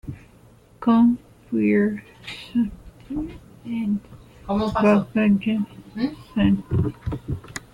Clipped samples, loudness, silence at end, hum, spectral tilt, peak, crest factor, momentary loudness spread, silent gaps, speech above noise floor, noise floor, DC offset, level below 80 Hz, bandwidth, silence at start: under 0.1%; -23 LUFS; 0.15 s; none; -7.5 dB/octave; -6 dBFS; 18 dB; 16 LU; none; 30 dB; -51 dBFS; under 0.1%; -44 dBFS; 11.5 kHz; 0.05 s